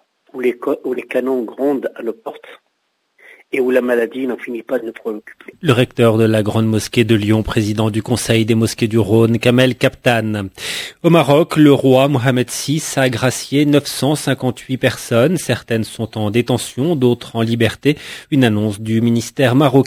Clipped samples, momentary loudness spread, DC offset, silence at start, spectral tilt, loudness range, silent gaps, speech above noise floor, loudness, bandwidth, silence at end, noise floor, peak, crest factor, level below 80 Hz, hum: under 0.1%; 10 LU; under 0.1%; 0.35 s; -6 dB/octave; 7 LU; none; 52 dB; -16 LUFS; 16 kHz; 0 s; -68 dBFS; 0 dBFS; 16 dB; -46 dBFS; none